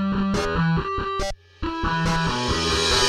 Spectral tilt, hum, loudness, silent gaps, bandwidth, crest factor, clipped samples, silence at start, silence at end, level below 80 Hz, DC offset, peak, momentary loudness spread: -4 dB/octave; none; -23 LUFS; none; 13.5 kHz; 16 dB; under 0.1%; 0 s; 0 s; -34 dBFS; under 0.1%; -6 dBFS; 9 LU